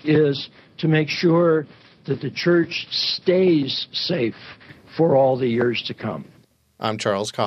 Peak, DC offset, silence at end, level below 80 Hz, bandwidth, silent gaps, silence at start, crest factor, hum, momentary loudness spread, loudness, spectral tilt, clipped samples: -6 dBFS; under 0.1%; 0 s; -64 dBFS; 10 kHz; none; 0.05 s; 16 dB; none; 15 LU; -21 LUFS; -6 dB/octave; under 0.1%